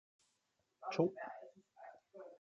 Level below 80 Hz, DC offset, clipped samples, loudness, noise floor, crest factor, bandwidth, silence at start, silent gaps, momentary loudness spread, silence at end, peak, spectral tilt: -90 dBFS; under 0.1%; under 0.1%; -41 LUFS; -84 dBFS; 26 dB; 8 kHz; 0.8 s; none; 21 LU; 0.05 s; -20 dBFS; -7 dB/octave